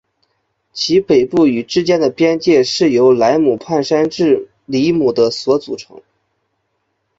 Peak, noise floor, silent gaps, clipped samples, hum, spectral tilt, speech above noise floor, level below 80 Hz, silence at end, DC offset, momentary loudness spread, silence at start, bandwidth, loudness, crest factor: -2 dBFS; -68 dBFS; none; under 0.1%; none; -5.5 dB/octave; 55 dB; -54 dBFS; 1.35 s; under 0.1%; 7 LU; 0.75 s; 7.8 kHz; -14 LUFS; 14 dB